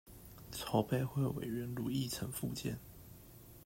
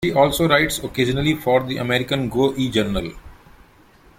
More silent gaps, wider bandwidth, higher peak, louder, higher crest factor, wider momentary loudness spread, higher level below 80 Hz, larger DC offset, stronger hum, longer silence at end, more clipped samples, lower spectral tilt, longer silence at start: neither; about the same, 16 kHz vs 16.5 kHz; second, -18 dBFS vs -2 dBFS; second, -39 LUFS vs -19 LUFS; about the same, 20 dB vs 18 dB; first, 20 LU vs 6 LU; second, -60 dBFS vs -40 dBFS; neither; neither; second, 0.05 s vs 0.85 s; neither; about the same, -5.5 dB/octave vs -5 dB/octave; about the same, 0.05 s vs 0 s